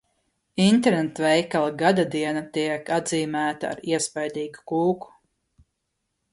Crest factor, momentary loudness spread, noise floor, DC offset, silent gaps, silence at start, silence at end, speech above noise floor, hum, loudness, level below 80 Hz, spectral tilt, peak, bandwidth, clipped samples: 18 dB; 10 LU; -78 dBFS; under 0.1%; none; 0.55 s; 1.25 s; 55 dB; none; -24 LUFS; -64 dBFS; -5 dB/octave; -6 dBFS; 11.5 kHz; under 0.1%